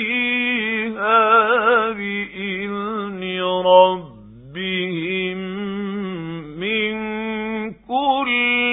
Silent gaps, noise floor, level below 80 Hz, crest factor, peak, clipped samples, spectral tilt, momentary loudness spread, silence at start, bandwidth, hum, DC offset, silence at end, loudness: none; -40 dBFS; -56 dBFS; 20 dB; 0 dBFS; under 0.1%; -10 dB/octave; 13 LU; 0 s; 4 kHz; none; under 0.1%; 0 s; -19 LUFS